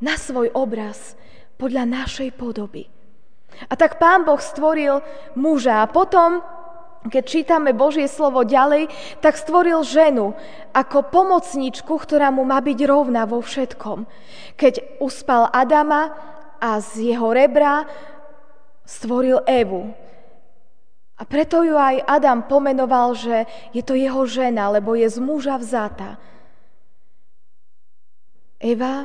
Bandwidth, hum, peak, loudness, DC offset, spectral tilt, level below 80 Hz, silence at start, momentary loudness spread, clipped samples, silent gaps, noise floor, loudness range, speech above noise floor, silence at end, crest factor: 10 kHz; none; -2 dBFS; -18 LUFS; 2%; -4.5 dB/octave; -50 dBFS; 0 s; 14 LU; under 0.1%; none; -72 dBFS; 7 LU; 54 dB; 0 s; 18 dB